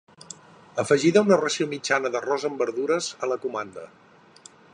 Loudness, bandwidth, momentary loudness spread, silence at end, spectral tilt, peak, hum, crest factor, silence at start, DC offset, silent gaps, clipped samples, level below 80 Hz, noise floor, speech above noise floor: -24 LUFS; 11 kHz; 24 LU; 0.85 s; -4.5 dB/octave; -6 dBFS; none; 20 dB; 0.3 s; under 0.1%; none; under 0.1%; -72 dBFS; -51 dBFS; 28 dB